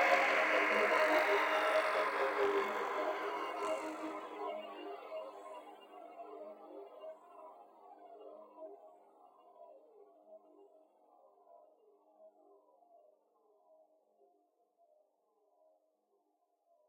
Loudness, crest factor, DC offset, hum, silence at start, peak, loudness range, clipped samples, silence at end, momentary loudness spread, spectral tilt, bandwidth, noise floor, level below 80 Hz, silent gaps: -34 LUFS; 24 dB; under 0.1%; none; 0 s; -16 dBFS; 25 LU; under 0.1%; 4.6 s; 24 LU; -2 dB/octave; 16.5 kHz; -80 dBFS; -86 dBFS; none